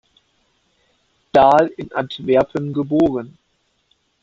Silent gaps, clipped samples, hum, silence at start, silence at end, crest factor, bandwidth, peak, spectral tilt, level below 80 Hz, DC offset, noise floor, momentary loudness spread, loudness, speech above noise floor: none; under 0.1%; none; 1.35 s; 0.9 s; 18 dB; 7.8 kHz; -2 dBFS; -7.5 dB/octave; -54 dBFS; under 0.1%; -66 dBFS; 13 LU; -17 LUFS; 50 dB